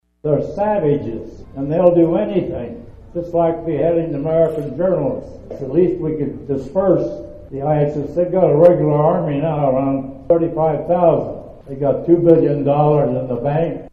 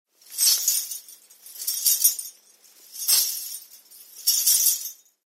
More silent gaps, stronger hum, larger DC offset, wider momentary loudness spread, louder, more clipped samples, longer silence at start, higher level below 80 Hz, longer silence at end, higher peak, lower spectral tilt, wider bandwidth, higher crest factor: neither; neither; neither; second, 15 LU vs 18 LU; first, -17 LUFS vs -20 LUFS; neither; about the same, 0.25 s vs 0.3 s; first, -42 dBFS vs under -90 dBFS; second, 0.05 s vs 0.35 s; first, 0 dBFS vs -4 dBFS; first, -10.5 dB/octave vs 6 dB/octave; second, 5 kHz vs 16.5 kHz; second, 16 dB vs 22 dB